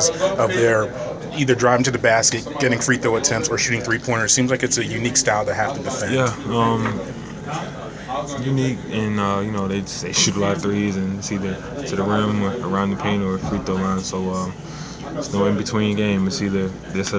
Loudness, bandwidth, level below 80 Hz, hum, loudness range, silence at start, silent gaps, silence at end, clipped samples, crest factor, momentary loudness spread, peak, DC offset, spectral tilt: -20 LUFS; 8 kHz; -44 dBFS; none; 5 LU; 0 s; none; 0 s; under 0.1%; 20 dB; 12 LU; -2 dBFS; under 0.1%; -4 dB/octave